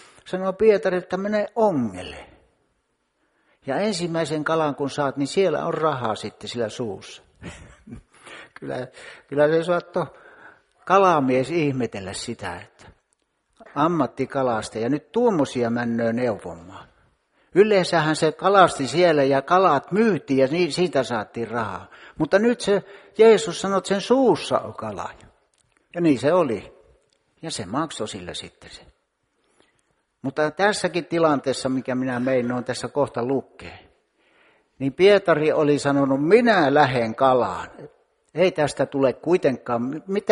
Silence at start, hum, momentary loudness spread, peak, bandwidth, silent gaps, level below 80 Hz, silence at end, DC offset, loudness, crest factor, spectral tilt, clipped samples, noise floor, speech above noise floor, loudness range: 0.25 s; none; 17 LU; 0 dBFS; 11.5 kHz; none; -58 dBFS; 0 s; under 0.1%; -21 LUFS; 22 dB; -5.5 dB/octave; under 0.1%; -71 dBFS; 50 dB; 8 LU